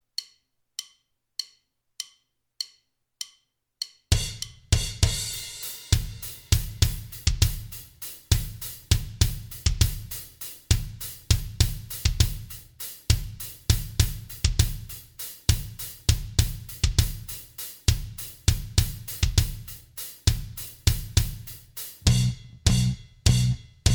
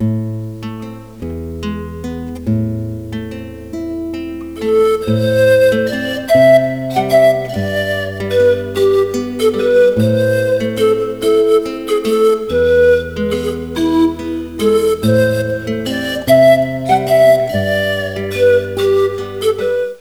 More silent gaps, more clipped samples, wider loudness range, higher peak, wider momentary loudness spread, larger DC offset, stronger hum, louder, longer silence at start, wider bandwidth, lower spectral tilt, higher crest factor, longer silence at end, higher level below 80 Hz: neither; neither; second, 3 LU vs 9 LU; second, -4 dBFS vs 0 dBFS; about the same, 14 LU vs 15 LU; second, under 0.1% vs 0.4%; neither; second, -27 LUFS vs -14 LUFS; first, 0.2 s vs 0 s; about the same, over 20 kHz vs over 20 kHz; second, -3.5 dB/octave vs -6 dB/octave; first, 24 dB vs 14 dB; about the same, 0 s vs 0.05 s; first, -32 dBFS vs -40 dBFS